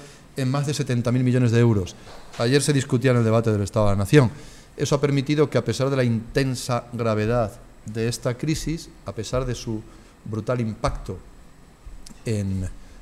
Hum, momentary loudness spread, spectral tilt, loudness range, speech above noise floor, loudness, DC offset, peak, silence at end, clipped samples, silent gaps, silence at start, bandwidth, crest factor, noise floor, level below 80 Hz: none; 16 LU; -6 dB/octave; 9 LU; 25 dB; -23 LUFS; under 0.1%; 0 dBFS; 0.05 s; under 0.1%; none; 0 s; 14 kHz; 22 dB; -47 dBFS; -40 dBFS